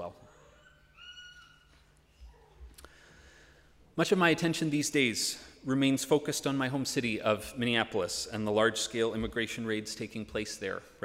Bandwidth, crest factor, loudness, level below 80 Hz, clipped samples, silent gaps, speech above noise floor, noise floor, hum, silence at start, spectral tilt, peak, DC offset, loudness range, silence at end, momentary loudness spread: 16 kHz; 22 dB; -31 LUFS; -58 dBFS; under 0.1%; none; 32 dB; -62 dBFS; none; 0 s; -4 dB/octave; -12 dBFS; under 0.1%; 4 LU; 0.15 s; 14 LU